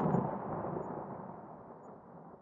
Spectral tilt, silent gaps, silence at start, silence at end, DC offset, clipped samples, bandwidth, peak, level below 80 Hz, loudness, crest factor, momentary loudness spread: -10.5 dB/octave; none; 0 s; 0 s; under 0.1%; under 0.1%; 7 kHz; -20 dBFS; -66 dBFS; -39 LUFS; 20 dB; 18 LU